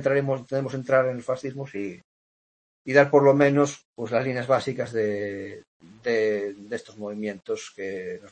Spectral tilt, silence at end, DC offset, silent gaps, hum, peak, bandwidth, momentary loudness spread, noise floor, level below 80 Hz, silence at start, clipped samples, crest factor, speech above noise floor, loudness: -6.5 dB/octave; 0.05 s; under 0.1%; 2.04-2.85 s, 3.85-3.94 s, 5.67-5.80 s; none; -4 dBFS; 8.8 kHz; 17 LU; under -90 dBFS; -68 dBFS; 0 s; under 0.1%; 22 dB; over 65 dB; -25 LUFS